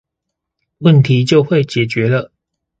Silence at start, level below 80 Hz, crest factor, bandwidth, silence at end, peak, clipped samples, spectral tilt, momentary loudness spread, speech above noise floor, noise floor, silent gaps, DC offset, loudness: 0.8 s; -52 dBFS; 14 dB; 8 kHz; 0.55 s; 0 dBFS; under 0.1%; -7.5 dB/octave; 7 LU; 66 dB; -78 dBFS; none; under 0.1%; -13 LUFS